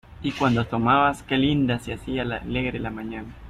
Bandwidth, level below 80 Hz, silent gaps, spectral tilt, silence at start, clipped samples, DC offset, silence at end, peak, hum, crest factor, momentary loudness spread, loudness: 13 kHz; -44 dBFS; none; -6.5 dB/octave; 0.1 s; under 0.1%; under 0.1%; 0 s; -6 dBFS; none; 18 dB; 11 LU; -24 LUFS